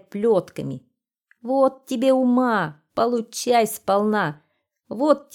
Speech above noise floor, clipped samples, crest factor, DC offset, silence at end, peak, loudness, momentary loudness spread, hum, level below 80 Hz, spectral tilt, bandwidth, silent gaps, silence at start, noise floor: 44 dB; under 0.1%; 18 dB; under 0.1%; 0.15 s; -2 dBFS; -21 LUFS; 13 LU; none; -66 dBFS; -5 dB/octave; 19 kHz; none; 0.15 s; -65 dBFS